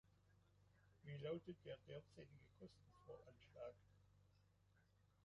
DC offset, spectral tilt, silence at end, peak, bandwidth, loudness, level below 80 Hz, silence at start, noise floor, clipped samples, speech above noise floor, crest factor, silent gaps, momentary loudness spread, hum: under 0.1%; -6 dB/octave; 0.05 s; -38 dBFS; 7.4 kHz; -58 LUFS; -80 dBFS; 0.05 s; -78 dBFS; under 0.1%; 20 dB; 22 dB; none; 15 LU; none